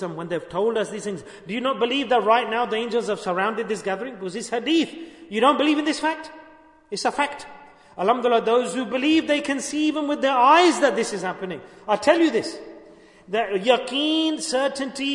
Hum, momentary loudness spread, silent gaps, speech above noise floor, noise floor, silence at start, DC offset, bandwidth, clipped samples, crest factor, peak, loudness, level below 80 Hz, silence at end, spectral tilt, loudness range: none; 13 LU; none; 28 dB; -50 dBFS; 0 s; under 0.1%; 11 kHz; under 0.1%; 18 dB; -4 dBFS; -22 LUFS; -64 dBFS; 0 s; -3.5 dB/octave; 4 LU